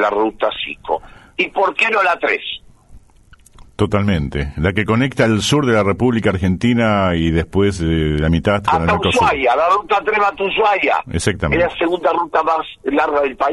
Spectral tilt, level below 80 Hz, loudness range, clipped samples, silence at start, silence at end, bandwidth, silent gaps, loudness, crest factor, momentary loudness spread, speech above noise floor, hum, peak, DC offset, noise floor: -5.5 dB/octave; -34 dBFS; 4 LU; under 0.1%; 0 s; 0 s; 11.5 kHz; none; -16 LUFS; 16 dB; 7 LU; 31 dB; none; -2 dBFS; under 0.1%; -47 dBFS